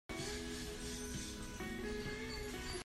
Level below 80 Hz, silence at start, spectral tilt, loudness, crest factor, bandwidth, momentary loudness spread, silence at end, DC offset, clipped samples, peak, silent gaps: -52 dBFS; 0.1 s; -3.5 dB/octave; -44 LUFS; 12 dB; 16 kHz; 2 LU; 0 s; under 0.1%; under 0.1%; -32 dBFS; none